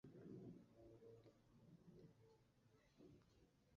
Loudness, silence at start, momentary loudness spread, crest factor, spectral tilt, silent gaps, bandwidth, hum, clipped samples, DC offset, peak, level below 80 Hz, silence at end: -65 LUFS; 0.05 s; 8 LU; 18 dB; -8 dB/octave; none; 7 kHz; none; under 0.1%; under 0.1%; -50 dBFS; -84 dBFS; 0 s